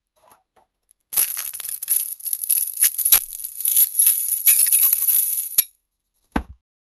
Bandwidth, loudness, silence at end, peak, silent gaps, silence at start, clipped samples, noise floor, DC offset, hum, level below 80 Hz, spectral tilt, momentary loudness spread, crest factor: over 20 kHz; -16 LUFS; 0.45 s; 0 dBFS; none; 1.1 s; under 0.1%; -71 dBFS; under 0.1%; none; -48 dBFS; 0.5 dB/octave; 16 LU; 22 dB